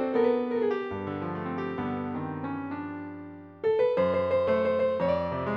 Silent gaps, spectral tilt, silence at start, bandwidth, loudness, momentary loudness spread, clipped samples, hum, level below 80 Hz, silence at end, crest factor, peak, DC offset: none; -9 dB/octave; 0 s; 5.8 kHz; -28 LUFS; 11 LU; under 0.1%; none; -60 dBFS; 0 s; 14 dB; -14 dBFS; under 0.1%